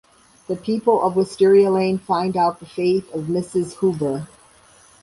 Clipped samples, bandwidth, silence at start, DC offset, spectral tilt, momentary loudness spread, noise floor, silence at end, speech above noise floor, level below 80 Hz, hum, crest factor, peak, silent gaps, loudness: under 0.1%; 11.5 kHz; 0.5 s; under 0.1%; -7 dB/octave; 10 LU; -51 dBFS; 0.8 s; 32 dB; -58 dBFS; none; 16 dB; -4 dBFS; none; -20 LUFS